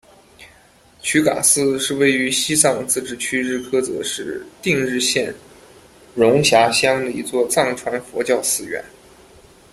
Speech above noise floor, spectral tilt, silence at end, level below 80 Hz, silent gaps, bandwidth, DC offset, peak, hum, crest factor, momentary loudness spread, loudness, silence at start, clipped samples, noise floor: 32 dB; -2.5 dB/octave; 0.85 s; -56 dBFS; none; 16 kHz; under 0.1%; 0 dBFS; none; 20 dB; 12 LU; -18 LUFS; 0.4 s; under 0.1%; -50 dBFS